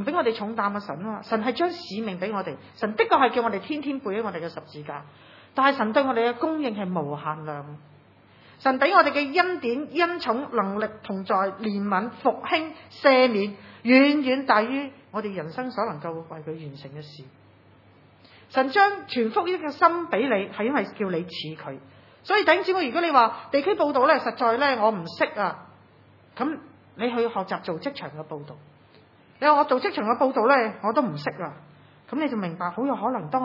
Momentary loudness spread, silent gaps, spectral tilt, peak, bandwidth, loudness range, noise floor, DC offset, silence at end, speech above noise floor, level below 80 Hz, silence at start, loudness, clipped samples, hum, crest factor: 17 LU; none; -7 dB/octave; -2 dBFS; 6 kHz; 7 LU; -55 dBFS; under 0.1%; 0 s; 30 dB; -76 dBFS; 0 s; -24 LUFS; under 0.1%; none; 22 dB